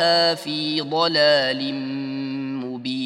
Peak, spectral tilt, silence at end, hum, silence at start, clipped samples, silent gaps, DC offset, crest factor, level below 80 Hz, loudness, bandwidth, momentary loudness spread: -4 dBFS; -4.5 dB/octave; 0 s; none; 0 s; under 0.1%; none; under 0.1%; 18 dB; -74 dBFS; -21 LUFS; 14.5 kHz; 11 LU